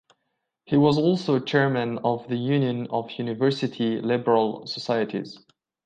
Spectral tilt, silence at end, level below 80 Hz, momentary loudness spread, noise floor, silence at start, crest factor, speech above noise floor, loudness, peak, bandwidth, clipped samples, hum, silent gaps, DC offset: -7.5 dB/octave; 0.5 s; -66 dBFS; 9 LU; -78 dBFS; 0.7 s; 18 dB; 55 dB; -24 LUFS; -8 dBFS; 9.2 kHz; under 0.1%; none; none; under 0.1%